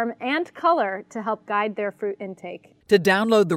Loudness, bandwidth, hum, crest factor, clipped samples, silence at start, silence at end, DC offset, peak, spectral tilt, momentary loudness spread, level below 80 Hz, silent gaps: -23 LUFS; 16 kHz; none; 18 dB; under 0.1%; 0 s; 0 s; under 0.1%; -4 dBFS; -5.5 dB/octave; 16 LU; -68 dBFS; none